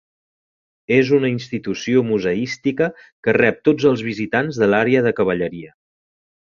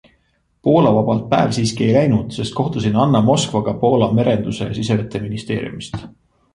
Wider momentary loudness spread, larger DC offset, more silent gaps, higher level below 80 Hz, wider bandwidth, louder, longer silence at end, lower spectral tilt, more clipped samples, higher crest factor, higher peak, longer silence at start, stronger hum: about the same, 9 LU vs 10 LU; neither; first, 3.12-3.23 s vs none; second, -56 dBFS vs -46 dBFS; second, 7.2 kHz vs 11.5 kHz; about the same, -18 LUFS vs -17 LUFS; first, 0.8 s vs 0.45 s; about the same, -6.5 dB/octave vs -6.5 dB/octave; neither; about the same, 18 dB vs 16 dB; about the same, -2 dBFS vs -2 dBFS; first, 0.9 s vs 0.65 s; neither